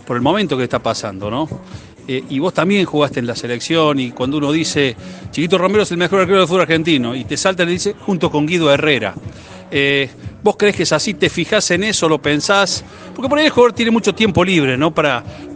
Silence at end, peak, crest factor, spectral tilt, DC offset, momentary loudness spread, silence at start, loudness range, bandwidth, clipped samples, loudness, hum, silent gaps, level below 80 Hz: 0 s; 0 dBFS; 16 dB; -4.5 dB/octave; under 0.1%; 10 LU; 0.05 s; 4 LU; 10 kHz; under 0.1%; -15 LUFS; none; none; -48 dBFS